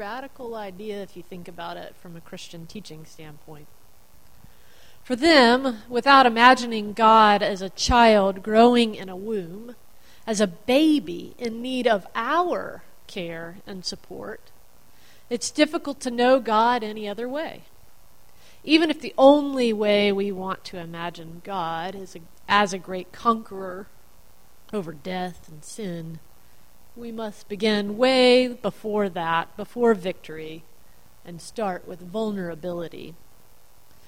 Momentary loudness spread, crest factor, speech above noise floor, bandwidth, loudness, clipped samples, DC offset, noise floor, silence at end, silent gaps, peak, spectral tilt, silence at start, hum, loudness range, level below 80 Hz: 23 LU; 24 dB; 34 dB; 16.5 kHz; -21 LUFS; under 0.1%; 0.7%; -56 dBFS; 0.95 s; none; 0 dBFS; -4 dB/octave; 0 s; none; 17 LU; -50 dBFS